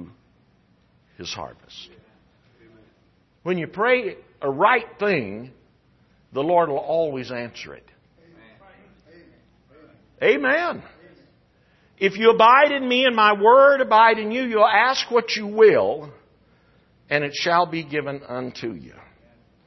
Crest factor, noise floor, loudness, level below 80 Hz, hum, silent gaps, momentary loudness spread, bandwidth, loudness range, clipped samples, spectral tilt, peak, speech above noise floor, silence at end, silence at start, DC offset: 18 dB; -61 dBFS; -19 LUFS; -64 dBFS; none; none; 20 LU; 6.2 kHz; 14 LU; under 0.1%; -4.5 dB/octave; -2 dBFS; 41 dB; 0.8 s; 0 s; under 0.1%